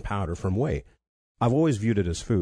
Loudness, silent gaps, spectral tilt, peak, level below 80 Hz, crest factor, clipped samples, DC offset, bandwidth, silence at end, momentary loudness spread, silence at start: -26 LUFS; 1.09-1.35 s; -7 dB/octave; -12 dBFS; -42 dBFS; 14 dB; under 0.1%; under 0.1%; 10.5 kHz; 0 s; 7 LU; 0 s